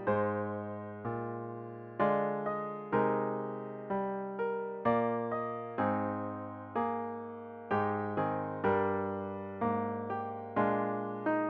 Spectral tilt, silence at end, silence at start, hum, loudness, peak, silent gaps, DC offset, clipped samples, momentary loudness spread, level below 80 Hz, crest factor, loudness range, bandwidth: -10 dB/octave; 0 s; 0 s; none; -35 LUFS; -18 dBFS; none; under 0.1%; under 0.1%; 10 LU; -70 dBFS; 16 dB; 1 LU; 4.9 kHz